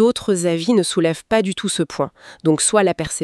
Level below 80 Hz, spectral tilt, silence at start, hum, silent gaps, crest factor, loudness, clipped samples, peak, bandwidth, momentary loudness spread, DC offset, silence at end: -50 dBFS; -4 dB/octave; 0 s; none; none; 16 dB; -18 LUFS; under 0.1%; -2 dBFS; 13.5 kHz; 8 LU; under 0.1%; 0 s